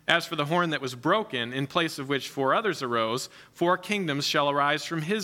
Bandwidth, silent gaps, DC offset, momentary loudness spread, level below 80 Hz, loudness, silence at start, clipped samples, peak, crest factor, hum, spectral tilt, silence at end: 17 kHz; none; under 0.1%; 5 LU; -72 dBFS; -27 LUFS; 0.1 s; under 0.1%; -6 dBFS; 20 dB; none; -4 dB/octave; 0 s